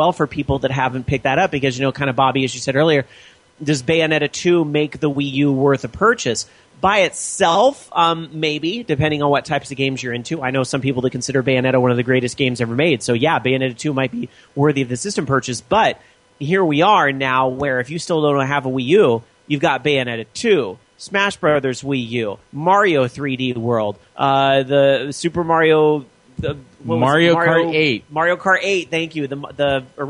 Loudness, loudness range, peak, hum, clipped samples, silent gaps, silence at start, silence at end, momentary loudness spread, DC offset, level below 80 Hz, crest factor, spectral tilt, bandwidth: -18 LUFS; 2 LU; -2 dBFS; none; under 0.1%; none; 0 s; 0 s; 9 LU; under 0.1%; -48 dBFS; 16 dB; -5 dB/octave; 11 kHz